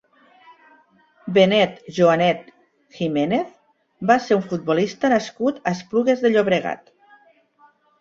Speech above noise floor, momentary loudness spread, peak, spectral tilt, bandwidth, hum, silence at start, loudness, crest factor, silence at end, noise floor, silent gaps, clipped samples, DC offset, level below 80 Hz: 37 dB; 11 LU; -2 dBFS; -6 dB/octave; 7.8 kHz; none; 1.25 s; -20 LUFS; 18 dB; 1.25 s; -57 dBFS; none; under 0.1%; under 0.1%; -62 dBFS